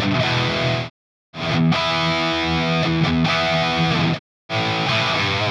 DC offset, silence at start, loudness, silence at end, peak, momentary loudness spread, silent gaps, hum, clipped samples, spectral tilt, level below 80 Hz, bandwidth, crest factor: under 0.1%; 0 s; -19 LUFS; 0 s; -6 dBFS; 8 LU; 0.90-1.33 s, 4.19-4.49 s; none; under 0.1%; -5.5 dB/octave; -44 dBFS; 9.8 kHz; 14 dB